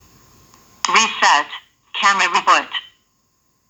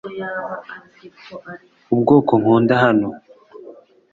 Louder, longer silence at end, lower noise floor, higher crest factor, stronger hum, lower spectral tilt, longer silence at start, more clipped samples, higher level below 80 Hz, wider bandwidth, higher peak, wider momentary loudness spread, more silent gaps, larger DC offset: about the same, -15 LUFS vs -16 LUFS; first, 0.85 s vs 0.4 s; first, -64 dBFS vs -43 dBFS; about the same, 20 dB vs 18 dB; neither; second, 0.5 dB/octave vs -9 dB/octave; first, 0.85 s vs 0.05 s; neither; second, -66 dBFS vs -58 dBFS; first, over 20 kHz vs 7.2 kHz; about the same, 0 dBFS vs -2 dBFS; second, 15 LU vs 24 LU; neither; neither